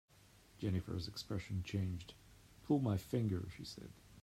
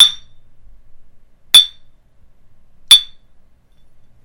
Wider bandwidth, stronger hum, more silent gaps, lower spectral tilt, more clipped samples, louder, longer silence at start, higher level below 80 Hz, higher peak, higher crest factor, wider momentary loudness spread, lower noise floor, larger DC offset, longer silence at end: about the same, 15.5 kHz vs 16.5 kHz; neither; neither; first, -7 dB/octave vs 3 dB/octave; second, under 0.1% vs 0.5%; second, -41 LUFS vs -9 LUFS; first, 0.55 s vs 0 s; second, -64 dBFS vs -48 dBFS; second, -22 dBFS vs 0 dBFS; about the same, 18 dB vs 18 dB; second, 19 LU vs 24 LU; first, -65 dBFS vs -45 dBFS; neither; second, 0 s vs 1.2 s